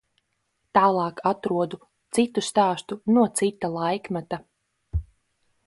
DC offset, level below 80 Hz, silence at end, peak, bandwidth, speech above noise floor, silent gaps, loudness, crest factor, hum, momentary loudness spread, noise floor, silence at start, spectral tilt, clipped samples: under 0.1%; -44 dBFS; 0.65 s; -6 dBFS; 11.5 kHz; 51 dB; none; -24 LUFS; 20 dB; none; 13 LU; -74 dBFS; 0.75 s; -5 dB/octave; under 0.1%